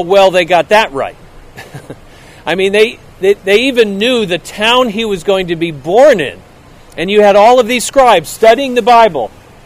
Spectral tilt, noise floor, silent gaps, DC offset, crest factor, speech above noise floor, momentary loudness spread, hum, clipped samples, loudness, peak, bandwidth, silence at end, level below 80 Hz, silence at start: -4 dB/octave; -37 dBFS; none; under 0.1%; 10 dB; 28 dB; 13 LU; none; 0.9%; -10 LUFS; 0 dBFS; 16.5 kHz; 0.35 s; -40 dBFS; 0 s